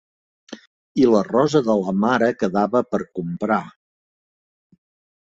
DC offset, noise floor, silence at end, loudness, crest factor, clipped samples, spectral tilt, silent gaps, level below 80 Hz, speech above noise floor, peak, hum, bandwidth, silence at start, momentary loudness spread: under 0.1%; under -90 dBFS; 1.5 s; -20 LUFS; 18 dB; under 0.1%; -7 dB/octave; 0.67-0.95 s; -60 dBFS; over 71 dB; -4 dBFS; none; 7.8 kHz; 0.5 s; 11 LU